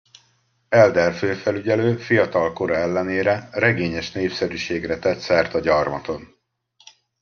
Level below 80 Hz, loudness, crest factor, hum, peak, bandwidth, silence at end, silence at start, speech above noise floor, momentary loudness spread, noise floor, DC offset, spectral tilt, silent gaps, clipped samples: -54 dBFS; -20 LUFS; 20 dB; none; -2 dBFS; 7 kHz; 0.95 s; 0.7 s; 44 dB; 9 LU; -64 dBFS; under 0.1%; -6 dB/octave; none; under 0.1%